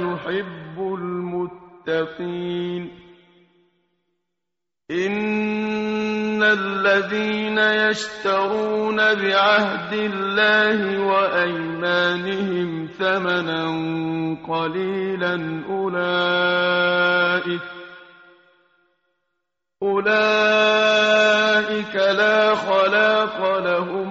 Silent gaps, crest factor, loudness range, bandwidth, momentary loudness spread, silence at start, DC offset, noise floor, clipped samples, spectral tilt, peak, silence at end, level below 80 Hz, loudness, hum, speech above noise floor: none; 16 dB; 11 LU; 7.6 kHz; 11 LU; 0 s; under 0.1%; -85 dBFS; under 0.1%; -2 dB/octave; -4 dBFS; 0 s; -62 dBFS; -20 LUFS; none; 65 dB